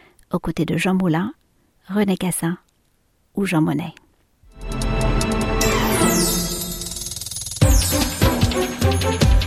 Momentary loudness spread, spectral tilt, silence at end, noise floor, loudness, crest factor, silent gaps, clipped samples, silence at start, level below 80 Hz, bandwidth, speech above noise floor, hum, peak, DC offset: 10 LU; -4.5 dB/octave; 0 s; -63 dBFS; -20 LUFS; 18 dB; none; under 0.1%; 0.3 s; -28 dBFS; 16 kHz; 42 dB; none; -2 dBFS; under 0.1%